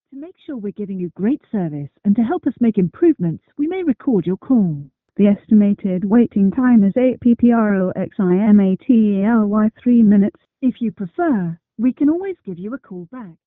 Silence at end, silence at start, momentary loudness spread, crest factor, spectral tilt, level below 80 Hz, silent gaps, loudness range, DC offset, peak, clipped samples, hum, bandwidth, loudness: 0.15 s; 0.15 s; 15 LU; 14 dB; -12 dB/octave; -54 dBFS; none; 5 LU; under 0.1%; -2 dBFS; under 0.1%; none; 3.7 kHz; -17 LUFS